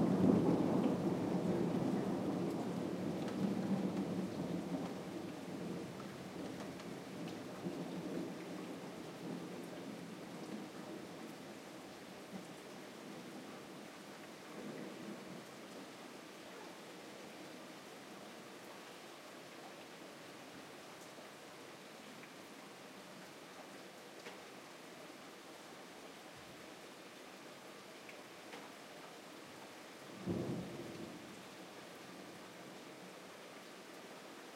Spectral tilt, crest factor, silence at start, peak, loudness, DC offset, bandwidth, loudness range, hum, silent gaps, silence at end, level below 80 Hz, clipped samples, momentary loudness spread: -6 dB/octave; 26 dB; 0 s; -18 dBFS; -45 LUFS; under 0.1%; 16 kHz; 13 LU; none; none; 0 s; -76 dBFS; under 0.1%; 15 LU